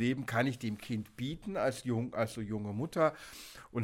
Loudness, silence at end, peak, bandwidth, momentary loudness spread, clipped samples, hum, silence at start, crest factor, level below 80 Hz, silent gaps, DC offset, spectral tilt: -35 LUFS; 0 s; -16 dBFS; 16.5 kHz; 9 LU; under 0.1%; none; 0 s; 20 dB; -62 dBFS; none; under 0.1%; -6 dB/octave